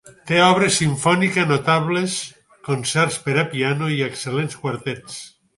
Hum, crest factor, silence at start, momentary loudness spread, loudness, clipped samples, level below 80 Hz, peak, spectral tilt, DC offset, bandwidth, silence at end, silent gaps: none; 20 dB; 0.05 s; 13 LU; -19 LUFS; under 0.1%; -56 dBFS; 0 dBFS; -4.5 dB/octave; under 0.1%; 11.5 kHz; 0.3 s; none